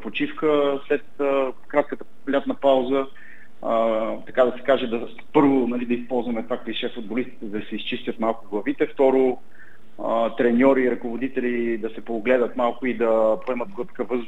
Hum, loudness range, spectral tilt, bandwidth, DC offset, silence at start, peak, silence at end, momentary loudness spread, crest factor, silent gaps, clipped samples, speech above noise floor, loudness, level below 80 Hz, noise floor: none; 3 LU; -7 dB/octave; 8 kHz; 2%; 0 s; -4 dBFS; 0 s; 11 LU; 20 dB; none; under 0.1%; 26 dB; -23 LUFS; -66 dBFS; -48 dBFS